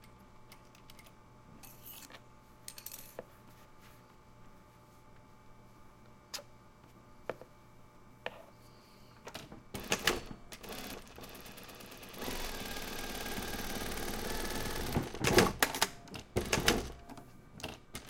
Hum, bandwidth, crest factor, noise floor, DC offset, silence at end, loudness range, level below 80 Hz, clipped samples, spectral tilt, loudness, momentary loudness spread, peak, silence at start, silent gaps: none; 17 kHz; 32 dB; -59 dBFS; under 0.1%; 0 s; 20 LU; -50 dBFS; under 0.1%; -3 dB/octave; -37 LUFS; 27 LU; -8 dBFS; 0 s; none